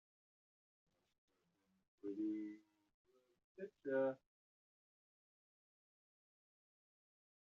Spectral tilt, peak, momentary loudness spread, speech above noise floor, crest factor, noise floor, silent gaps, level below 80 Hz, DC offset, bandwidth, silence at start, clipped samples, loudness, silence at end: -6.5 dB/octave; -30 dBFS; 16 LU; 40 dB; 22 dB; -83 dBFS; 2.94-3.05 s, 3.44-3.55 s; under -90 dBFS; under 0.1%; 6.6 kHz; 2.05 s; under 0.1%; -45 LUFS; 3.3 s